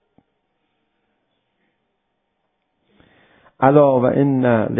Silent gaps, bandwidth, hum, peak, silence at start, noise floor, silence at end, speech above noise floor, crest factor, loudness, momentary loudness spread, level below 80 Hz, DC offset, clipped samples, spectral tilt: none; 3.8 kHz; none; 0 dBFS; 3.6 s; -72 dBFS; 0 s; 58 dB; 20 dB; -15 LUFS; 4 LU; -56 dBFS; under 0.1%; under 0.1%; -13 dB/octave